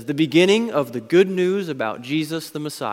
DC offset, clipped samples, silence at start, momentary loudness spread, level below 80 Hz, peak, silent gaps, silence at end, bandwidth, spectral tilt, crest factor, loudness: under 0.1%; under 0.1%; 0 s; 11 LU; -68 dBFS; -2 dBFS; none; 0 s; 16.5 kHz; -5.5 dB/octave; 18 dB; -20 LUFS